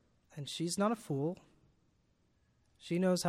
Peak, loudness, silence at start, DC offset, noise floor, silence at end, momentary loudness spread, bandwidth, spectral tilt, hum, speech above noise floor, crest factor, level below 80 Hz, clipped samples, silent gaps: -20 dBFS; -36 LUFS; 0.35 s; under 0.1%; -74 dBFS; 0 s; 18 LU; 15.5 kHz; -5.5 dB/octave; none; 39 dB; 18 dB; -76 dBFS; under 0.1%; none